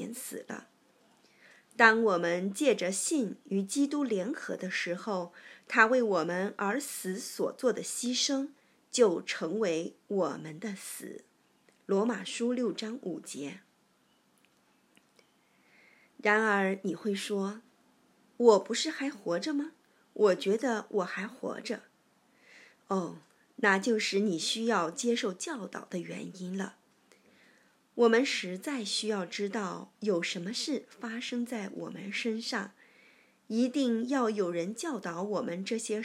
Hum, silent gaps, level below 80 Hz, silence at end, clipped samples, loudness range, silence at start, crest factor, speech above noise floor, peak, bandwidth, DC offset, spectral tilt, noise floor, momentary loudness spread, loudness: none; none; under -90 dBFS; 0 s; under 0.1%; 6 LU; 0 s; 26 dB; 38 dB; -6 dBFS; 16 kHz; under 0.1%; -3.5 dB/octave; -69 dBFS; 15 LU; -31 LUFS